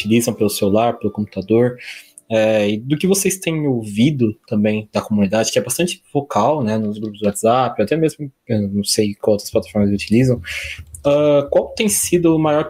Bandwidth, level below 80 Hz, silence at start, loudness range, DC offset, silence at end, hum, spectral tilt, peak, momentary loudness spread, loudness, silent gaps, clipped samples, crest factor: 16 kHz; -48 dBFS; 0 s; 1 LU; under 0.1%; 0 s; none; -5 dB/octave; -2 dBFS; 8 LU; -17 LUFS; none; under 0.1%; 16 dB